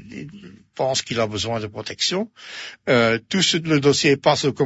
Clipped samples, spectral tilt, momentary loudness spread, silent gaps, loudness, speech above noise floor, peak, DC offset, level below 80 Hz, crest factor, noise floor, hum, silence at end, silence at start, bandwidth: under 0.1%; -4 dB/octave; 17 LU; none; -20 LUFS; 22 dB; -4 dBFS; under 0.1%; -58 dBFS; 18 dB; -42 dBFS; none; 0 s; 0 s; 8 kHz